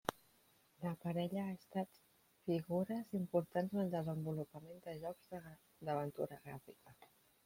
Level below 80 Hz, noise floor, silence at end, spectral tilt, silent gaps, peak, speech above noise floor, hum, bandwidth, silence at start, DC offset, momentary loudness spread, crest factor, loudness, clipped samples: -78 dBFS; -73 dBFS; 0.4 s; -7.5 dB/octave; none; -16 dBFS; 30 dB; none; 16.5 kHz; 0.05 s; under 0.1%; 14 LU; 26 dB; -43 LUFS; under 0.1%